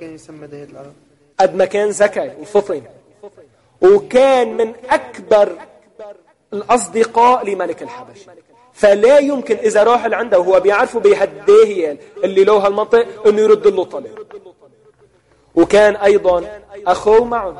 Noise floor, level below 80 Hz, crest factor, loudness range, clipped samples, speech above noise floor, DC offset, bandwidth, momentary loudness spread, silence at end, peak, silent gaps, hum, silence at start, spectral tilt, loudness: -53 dBFS; -50 dBFS; 14 dB; 4 LU; under 0.1%; 40 dB; under 0.1%; 11.5 kHz; 18 LU; 0 s; -2 dBFS; none; none; 0 s; -4.5 dB/octave; -13 LUFS